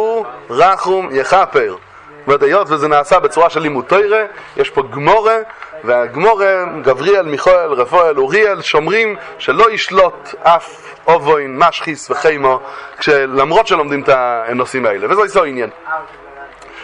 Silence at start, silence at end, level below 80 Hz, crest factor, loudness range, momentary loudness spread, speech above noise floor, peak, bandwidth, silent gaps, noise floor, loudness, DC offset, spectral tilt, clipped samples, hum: 0 s; 0 s; -50 dBFS; 14 dB; 2 LU; 10 LU; 21 dB; 0 dBFS; 10.5 kHz; none; -34 dBFS; -13 LUFS; under 0.1%; -4.5 dB/octave; under 0.1%; none